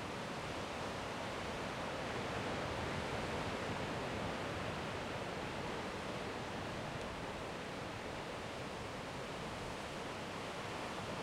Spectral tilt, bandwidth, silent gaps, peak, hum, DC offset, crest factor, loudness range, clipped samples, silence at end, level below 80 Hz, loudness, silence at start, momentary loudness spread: -4.5 dB/octave; 16 kHz; none; -28 dBFS; none; under 0.1%; 14 dB; 3 LU; under 0.1%; 0 s; -60 dBFS; -42 LUFS; 0 s; 4 LU